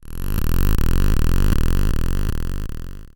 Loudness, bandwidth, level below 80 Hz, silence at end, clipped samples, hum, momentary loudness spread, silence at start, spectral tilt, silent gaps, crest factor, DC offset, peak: -23 LUFS; 17.5 kHz; -18 dBFS; 0.1 s; under 0.1%; none; 9 LU; 0.1 s; -6 dB/octave; none; 12 dB; under 0.1%; -4 dBFS